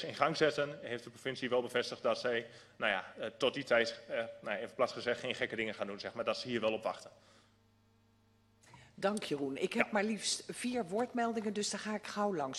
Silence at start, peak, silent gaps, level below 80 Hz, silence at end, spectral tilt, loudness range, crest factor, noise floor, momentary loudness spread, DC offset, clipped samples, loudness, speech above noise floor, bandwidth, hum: 0 s; -12 dBFS; none; -76 dBFS; 0 s; -3.5 dB/octave; 5 LU; 24 dB; -70 dBFS; 8 LU; under 0.1%; under 0.1%; -36 LUFS; 33 dB; 13 kHz; 50 Hz at -70 dBFS